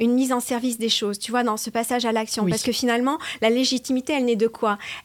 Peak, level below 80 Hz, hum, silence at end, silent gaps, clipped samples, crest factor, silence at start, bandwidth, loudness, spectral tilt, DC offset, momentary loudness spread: -6 dBFS; -60 dBFS; none; 0.05 s; none; under 0.1%; 16 dB; 0 s; 17.5 kHz; -22 LUFS; -3.5 dB/octave; under 0.1%; 4 LU